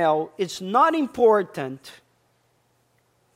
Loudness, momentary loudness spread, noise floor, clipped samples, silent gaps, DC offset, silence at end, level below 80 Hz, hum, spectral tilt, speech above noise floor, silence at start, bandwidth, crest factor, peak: -22 LUFS; 14 LU; -66 dBFS; under 0.1%; none; under 0.1%; 1.45 s; -68 dBFS; none; -5 dB/octave; 44 dB; 0 s; 15.5 kHz; 18 dB; -6 dBFS